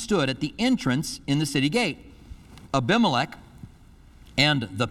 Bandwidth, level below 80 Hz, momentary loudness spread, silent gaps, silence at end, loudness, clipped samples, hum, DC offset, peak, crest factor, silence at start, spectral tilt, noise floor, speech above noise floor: 15.5 kHz; -50 dBFS; 8 LU; none; 0 s; -24 LUFS; under 0.1%; none; under 0.1%; -6 dBFS; 20 dB; 0 s; -5 dB/octave; -50 dBFS; 27 dB